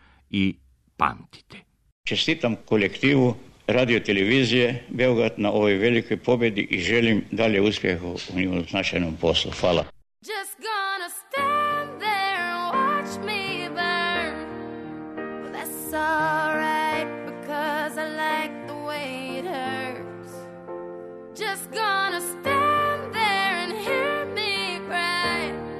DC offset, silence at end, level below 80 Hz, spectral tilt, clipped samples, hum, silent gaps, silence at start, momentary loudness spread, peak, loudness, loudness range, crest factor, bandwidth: under 0.1%; 0 s; -54 dBFS; -4.5 dB/octave; under 0.1%; none; 1.92-2.04 s; 0.3 s; 13 LU; -4 dBFS; -24 LUFS; 7 LU; 20 dB; 13.5 kHz